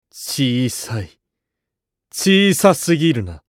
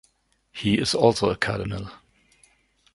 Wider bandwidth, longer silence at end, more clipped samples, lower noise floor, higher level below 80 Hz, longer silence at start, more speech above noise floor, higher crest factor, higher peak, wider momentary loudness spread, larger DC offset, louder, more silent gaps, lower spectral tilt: first, 17 kHz vs 11.5 kHz; second, 0.1 s vs 1 s; neither; first, -82 dBFS vs -66 dBFS; about the same, -50 dBFS vs -50 dBFS; second, 0.15 s vs 0.55 s; first, 66 dB vs 43 dB; about the same, 18 dB vs 22 dB; first, 0 dBFS vs -4 dBFS; second, 15 LU vs 18 LU; neither; first, -16 LUFS vs -23 LUFS; neither; about the same, -4.5 dB/octave vs -5 dB/octave